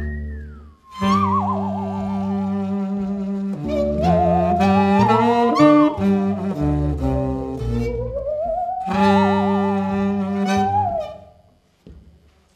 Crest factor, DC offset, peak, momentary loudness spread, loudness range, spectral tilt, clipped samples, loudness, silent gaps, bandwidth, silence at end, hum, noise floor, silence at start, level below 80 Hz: 18 dB; under 0.1%; -2 dBFS; 10 LU; 6 LU; -8 dB/octave; under 0.1%; -19 LUFS; none; 9.6 kHz; 0.55 s; none; -55 dBFS; 0 s; -36 dBFS